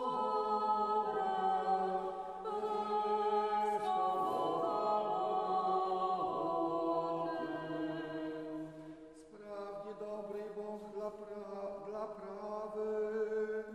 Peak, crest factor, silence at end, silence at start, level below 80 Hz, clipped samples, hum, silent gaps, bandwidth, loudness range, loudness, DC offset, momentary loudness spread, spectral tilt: -22 dBFS; 14 dB; 0 s; 0 s; -74 dBFS; under 0.1%; none; none; 12.5 kHz; 10 LU; -37 LUFS; under 0.1%; 12 LU; -6 dB/octave